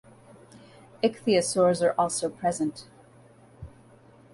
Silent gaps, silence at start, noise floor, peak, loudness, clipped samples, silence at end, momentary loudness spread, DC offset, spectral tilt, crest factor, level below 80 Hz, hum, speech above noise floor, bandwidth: none; 0.55 s; -54 dBFS; -10 dBFS; -26 LUFS; under 0.1%; 0.65 s; 25 LU; under 0.1%; -4.5 dB/octave; 18 dB; -60 dBFS; none; 29 dB; 11.5 kHz